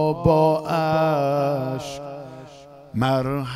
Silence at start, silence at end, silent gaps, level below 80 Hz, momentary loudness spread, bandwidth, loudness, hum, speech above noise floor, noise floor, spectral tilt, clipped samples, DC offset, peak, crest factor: 0 s; 0 s; none; -46 dBFS; 18 LU; 15.5 kHz; -21 LUFS; none; 23 dB; -44 dBFS; -7 dB/octave; under 0.1%; under 0.1%; -4 dBFS; 18 dB